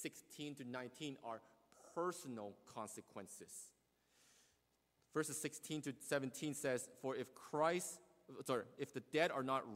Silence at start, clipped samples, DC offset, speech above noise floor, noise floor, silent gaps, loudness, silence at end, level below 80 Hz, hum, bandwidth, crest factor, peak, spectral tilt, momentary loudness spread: 0 s; under 0.1%; under 0.1%; 36 dB; -81 dBFS; none; -45 LUFS; 0 s; -86 dBFS; none; 16 kHz; 24 dB; -22 dBFS; -4 dB/octave; 15 LU